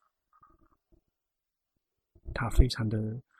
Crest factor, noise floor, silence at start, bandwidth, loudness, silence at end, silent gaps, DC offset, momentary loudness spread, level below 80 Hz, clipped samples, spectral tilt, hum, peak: 26 dB; -87 dBFS; 2.25 s; 13.5 kHz; -31 LUFS; 0.2 s; none; under 0.1%; 13 LU; -34 dBFS; under 0.1%; -6 dB/octave; none; -6 dBFS